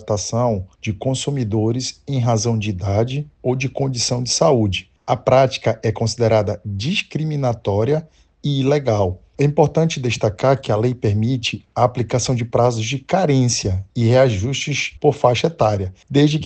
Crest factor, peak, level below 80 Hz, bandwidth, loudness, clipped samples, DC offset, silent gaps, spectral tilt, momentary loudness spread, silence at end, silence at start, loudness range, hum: 18 dB; 0 dBFS; -46 dBFS; 9 kHz; -19 LUFS; under 0.1%; under 0.1%; none; -5.5 dB/octave; 8 LU; 0 s; 0 s; 3 LU; none